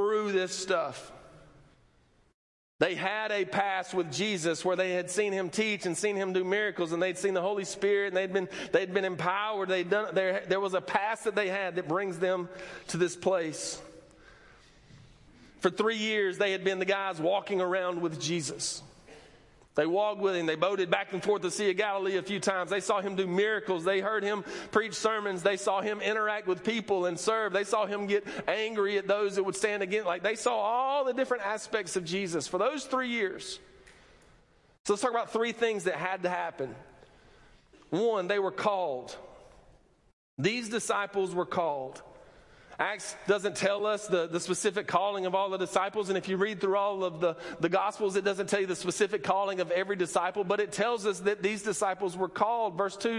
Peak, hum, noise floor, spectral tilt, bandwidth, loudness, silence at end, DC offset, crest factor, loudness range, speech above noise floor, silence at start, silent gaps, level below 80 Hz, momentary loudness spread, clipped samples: -10 dBFS; none; -65 dBFS; -4 dB/octave; 11.5 kHz; -30 LUFS; 0 s; under 0.1%; 20 dB; 4 LU; 35 dB; 0 s; 2.34-2.79 s, 34.80-34.85 s, 40.13-40.37 s; -70 dBFS; 4 LU; under 0.1%